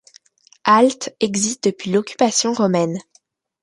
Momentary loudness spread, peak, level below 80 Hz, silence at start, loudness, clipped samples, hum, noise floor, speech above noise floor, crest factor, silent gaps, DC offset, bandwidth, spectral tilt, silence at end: 9 LU; 0 dBFS; -64 dBFS; 0.65 s; -18 LUFS; under 0.1%; none; -59 dBFS; 41 dB; 18 dB; none; under 0.1%; 11.5 kHz; -4 dB/octave; 0.6 s